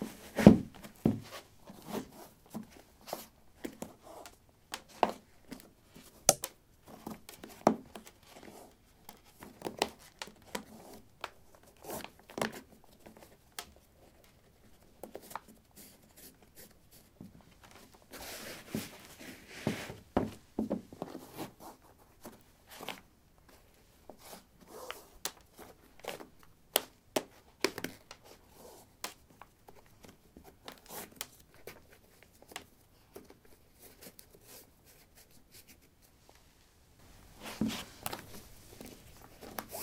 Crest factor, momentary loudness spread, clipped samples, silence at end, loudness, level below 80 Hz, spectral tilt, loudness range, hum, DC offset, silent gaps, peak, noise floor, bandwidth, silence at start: 38 dB; 23 LU; under 0.1%; 0 s; -36 LUFS; -60 dBFS; -4.5 dB/octave; 18 LU; none; under 0.1%; none; -2 dBFS; -64 dBFS; 17 kHz; 0 s